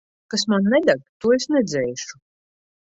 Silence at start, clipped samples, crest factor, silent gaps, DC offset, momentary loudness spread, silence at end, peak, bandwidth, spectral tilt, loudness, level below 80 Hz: 0.3 s; under 0.1%; 18 dB; 1.09-1.20 s; under 0.1%; 10 LU; 0.85 s; -4 dBFS; 8.2 kHz; -4.5 dB/octave; -20 LUFS; -60 dBFS